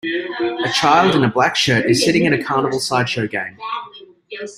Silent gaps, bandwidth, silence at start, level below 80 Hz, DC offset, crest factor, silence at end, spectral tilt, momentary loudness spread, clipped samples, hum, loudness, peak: none; 16 kHz; 0.05 s; -54 dBFS; under 0.1%; 16 dB; 0.05 s; -4.5 dB/octave; 14 LU; under 0.1%; none; -17 LUFS; -2 dBFS